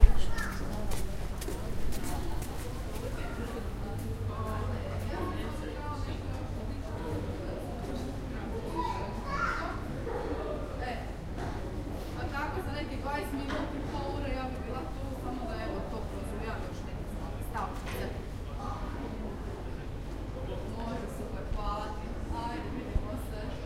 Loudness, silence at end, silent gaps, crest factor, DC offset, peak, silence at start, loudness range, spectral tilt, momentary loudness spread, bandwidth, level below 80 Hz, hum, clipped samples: -37 LUFS; 0 s; none; 28 dB; under 0.1%; -4 dBFS; 0 s; 3 LU; -6 dB/octave; 4 LU; 16 kHz; -36 dBFS; none; under 0.1%